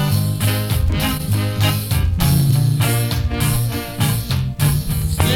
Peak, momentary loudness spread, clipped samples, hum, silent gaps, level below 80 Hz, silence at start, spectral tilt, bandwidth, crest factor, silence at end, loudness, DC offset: 0 dBFS; 4 LU; under 0.1%; none; none; -26 dBFS; 0 s; -5 dB/octave; 18.5 kHz; 16 dB; 0 s; -18 LUFS; under 0.1%